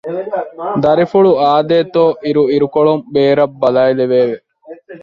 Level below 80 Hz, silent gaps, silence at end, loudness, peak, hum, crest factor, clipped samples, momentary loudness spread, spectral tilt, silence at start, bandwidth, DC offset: -54 dBFS; none; 0.05 s; -13 LUFS; 0 dBFS; none; 12 dB; under 0.1%; 10 LU; -8.5 dB/octave; 0.05 s; 6 kHz; under 0.1%